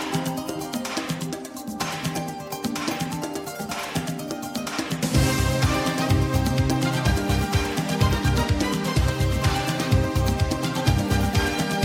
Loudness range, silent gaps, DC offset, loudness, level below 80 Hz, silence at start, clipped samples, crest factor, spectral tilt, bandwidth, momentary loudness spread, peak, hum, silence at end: 6 LU; none; under 0.1%; -24 LUFS; -32 dBFS; 0 s; under 0.1%; 16 dB; -5 dB/octave; 16.5 kHz; 8 LU; -6 dBFS; none; 0 s